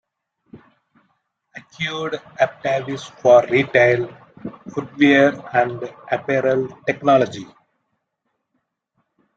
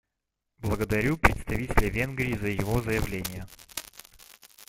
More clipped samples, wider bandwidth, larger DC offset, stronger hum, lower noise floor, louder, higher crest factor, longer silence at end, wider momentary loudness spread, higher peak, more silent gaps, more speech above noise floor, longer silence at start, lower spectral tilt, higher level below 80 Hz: neither; second, 7.8 kHz vs 16.5 kHz; neither; neither; second, -75 dBFS vs -83 dBFS; first, -18 LUFS vs -28 LUFS; second, 18 dB vs 28 dB; first, 1.95 s vs 0.05 s; first, 17 LU vs 14 LU; about the same, -2 dBFS vs -2 dBFS; neither; about the same, 57 dB vs 57 dB; about the same, 0.55 s vs 0.6 s; about the same, -6 dB/octave vs -5.5 dB/octave; second, -62 dBFS vs -36 dBFS